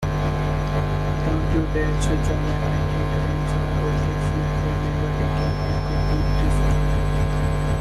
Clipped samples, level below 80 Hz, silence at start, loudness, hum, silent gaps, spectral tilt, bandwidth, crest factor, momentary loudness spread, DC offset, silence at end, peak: under 0.1%; -26 dBFS; 0 s; -23 LUFS; none; none; -7 dB/octave; 12.5 kHz; 10 dB; 2 LU; under 0.1%; 0 s; -10 dBFS